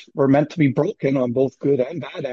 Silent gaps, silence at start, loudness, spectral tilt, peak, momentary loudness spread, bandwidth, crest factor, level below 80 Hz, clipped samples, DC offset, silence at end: none; 0 s; -20 LUFS; -8.5 dB/octave; -4 dBFS; 5 LU; 7 kHz; 16 dB; -60 dBFS; under 0.1%; under 0.1%; 0 s